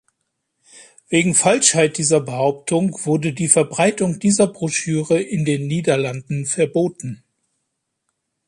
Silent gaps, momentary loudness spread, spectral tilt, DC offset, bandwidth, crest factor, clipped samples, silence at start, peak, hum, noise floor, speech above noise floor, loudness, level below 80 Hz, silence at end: none; 9 LU; -4 dB/octave; under 0.1%; 11.5 kHz; 20 dB; under 0.1%; 0.75 s; 0 dBFS; none; -75 dBFS; 57 dB; -18 LUFS; -60 dBFS; 1.35 s